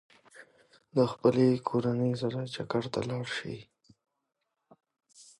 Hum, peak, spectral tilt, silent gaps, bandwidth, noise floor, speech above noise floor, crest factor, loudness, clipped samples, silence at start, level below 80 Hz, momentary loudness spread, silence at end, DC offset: none; -10 dBFS; -7 dB/octave; none; 11.5 kHz; -64 dBFS; 35 dB; 22 dB; -30 LUFS; under 0.1%; 0.35 s; -68 dBFS; 11 LU; 0.15 s; under 0.1%